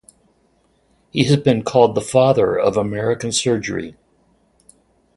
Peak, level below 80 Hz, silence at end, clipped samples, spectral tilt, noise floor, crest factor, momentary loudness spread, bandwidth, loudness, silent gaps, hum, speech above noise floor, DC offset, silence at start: 0 dBFS; -52 dBFS; 1.25 s; under 0.1%; -5 dB/octave; -60 dBFS; 18 dB; 11 LU; 11.5 kHz; -17 LUFS; none; none; 44 dB; under 0.1%; 1.15 s